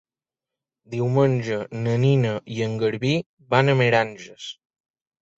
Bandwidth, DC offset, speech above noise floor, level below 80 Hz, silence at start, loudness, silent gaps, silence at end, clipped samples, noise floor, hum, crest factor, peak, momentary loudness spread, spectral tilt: 7.8 kHz; under 0.1%; 68 dB; -60 dBFS; 0.9 s; -22 LUFS; 3.26-3.37 s; 0.85 s; under 0.1%; -89 dBFS; none; 18 dB; -4 dBFS; 15 LU; -7 dB/octave